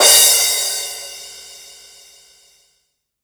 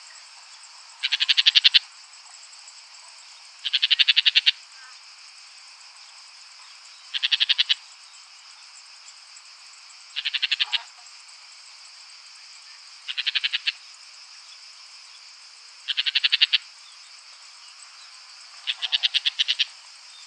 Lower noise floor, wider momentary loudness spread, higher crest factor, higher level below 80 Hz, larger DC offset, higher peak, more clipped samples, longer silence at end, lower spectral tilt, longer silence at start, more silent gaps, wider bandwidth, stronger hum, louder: first, -68 dBFS vs -47 dBFS; about the same, 27 LU vs 26 LU; second, 18 dB vs 28 dB; first, -58 dBFS vs under -90 dBFS; neither; about the same, 0 dBFS vs 0 dBFS; neither; first, 1.7 s vs 0 s; first, 3 dB/octave vs 10 dB/octave; second, 0 s vs 0.15 s; neither; first, over 20 kHz vs 11 kHz; neither; first, -12 LUFS vs -21 LUFS